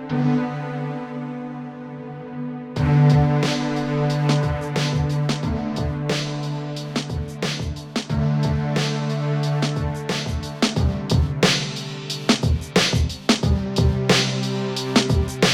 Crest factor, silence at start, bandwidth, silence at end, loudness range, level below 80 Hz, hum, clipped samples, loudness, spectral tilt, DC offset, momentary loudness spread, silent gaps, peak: 18 dB; 0 s; 14.5 kHz; 0 s; 4 LU; -36 dBFS; none; under 0.1%; -22 LUFS; -5.5 dB/octave; under 0.1%; 11 LU; none; -4 dBFS